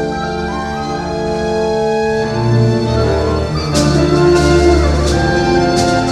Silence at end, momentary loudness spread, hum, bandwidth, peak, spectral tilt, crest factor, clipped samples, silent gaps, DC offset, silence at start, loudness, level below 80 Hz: 0 s; 9 LU; none; 12.5 kHz; 0 dBFS; -6 dB/octave; 12 dB; under 0.1%; none; under 0.1%; 0 s; -14 LUFS; -24 dBFS